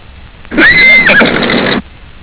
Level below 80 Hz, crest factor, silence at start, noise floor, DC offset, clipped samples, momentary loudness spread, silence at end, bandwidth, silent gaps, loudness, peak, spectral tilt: -32 dBFS; 8 dB; 0.15 s; -31 dBFS; under 0.1%; under 0.1%; 13 LU; 0.15 s; 4 kHz; none; -5 LUFS; 0 dBFS; -7 dB/octave